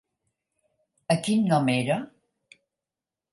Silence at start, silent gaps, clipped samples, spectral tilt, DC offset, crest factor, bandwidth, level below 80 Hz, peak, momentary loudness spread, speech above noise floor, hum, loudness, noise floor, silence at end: 1.1 s; none; under 0.1%; -6 dB/octave; under 0.1%; 22 dB; 11.5 kHz; -72 dBFS; -8 dBFS; 18 LU; 66 dB; none; -25 LUFS; -90 dBFS; 1.25 s